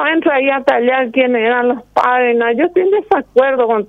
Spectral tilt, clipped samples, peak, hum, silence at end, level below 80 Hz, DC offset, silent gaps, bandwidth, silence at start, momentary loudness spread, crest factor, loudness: -6 dB/octave; under 0.1%; 0 dBFS; none; 0.05 s; -56 dBFS; under 0.1%; none; 6.2 kHz; 0 s; 2 LU; 12 dB; -13 LUFS